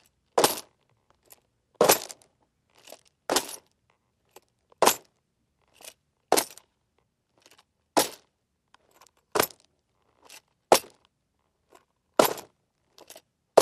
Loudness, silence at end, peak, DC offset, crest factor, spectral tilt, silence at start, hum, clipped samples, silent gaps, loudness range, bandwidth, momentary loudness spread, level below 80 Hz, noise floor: -25 LUFS; 0 s; 0 dBFS; under 0.1%; 30 dB; -1.5 dB/octave; 0.35 s; none; under 0.1%; none; 4 LU; 15.5 kHz; 20 LU; -68 dBFS; -76 dBFS